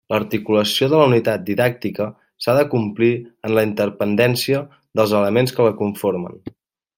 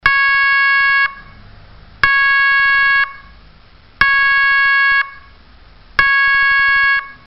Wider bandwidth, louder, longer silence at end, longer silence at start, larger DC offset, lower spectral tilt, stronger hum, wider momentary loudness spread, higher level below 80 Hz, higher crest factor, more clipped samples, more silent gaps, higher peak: first, 17 kHz vs 5.8 kHz; second, -18 LUFS vs -11 LUFS; first, 0.5 s vs 0.15 s; about the same, 0.1 s vs 0.05 s; neither; first, -6 dB/octave vs 3 dB/octave; neither; first, 10 LU vs 5 LU; second, -60 dBFS vs -42 dBFS; about the same, 16 dB vs 14 dB; neither; neither; about the same, -2 dBFS vs 0 dBFS